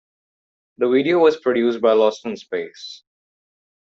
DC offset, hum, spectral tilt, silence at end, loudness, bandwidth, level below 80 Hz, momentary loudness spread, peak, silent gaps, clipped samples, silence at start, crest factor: under 0.1%; none; -5.5 dB/octave; 0.9 s; -18 LUFS; 7.4 kHz; -70 dBFS; 16 LU; -4 dBFS; none; under 0.1%; 0.8 s; 18 dB